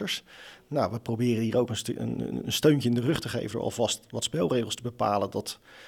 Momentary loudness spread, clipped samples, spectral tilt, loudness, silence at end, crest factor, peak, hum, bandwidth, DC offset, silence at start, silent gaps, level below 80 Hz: 9 LU; under 0.1%; -5 dB/octave; -28 LUFS; 0 s; 18 dB; -10 dBFS; none; 18.5 kHz; under 0.1%; 0 s; none; -58 dBFS